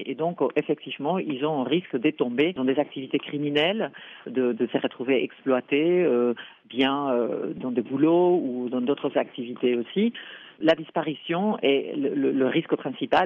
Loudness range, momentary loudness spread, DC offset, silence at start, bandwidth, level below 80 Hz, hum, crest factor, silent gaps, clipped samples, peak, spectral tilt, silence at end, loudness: 2 LU; 7 LU; under 0.1%; 0 s; 5.8 kHz; -70 dBFS; none; 16 dB; none; under 0.1%; -8 dBFS; -8 dB/octave; 0 s; -25 LUFS